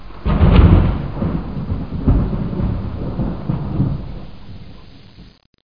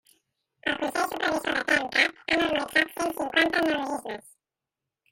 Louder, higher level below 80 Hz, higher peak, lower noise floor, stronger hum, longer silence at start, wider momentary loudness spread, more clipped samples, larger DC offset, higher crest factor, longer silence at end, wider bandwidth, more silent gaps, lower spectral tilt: first, -18 LUFS vs -25 LUFS; first, -22 dBFS vs -62 dBFS; first, 0 dBFS vs -8 dBFS; second, -42 dBFS vs -88 dBFS; neither; second, 0 s vs 0.65 s; first, 22 LU vs 10 LU; neither; first, 2% vs under 0.1%; about the same, 18 dB vs 20 dB; second, 0 s vs 0.9 s; second, 5.2 kHz vs 17 kHz; first, 5.46-5.53 s vs none; first, -11 dB/octave vs -2.5 dB/octave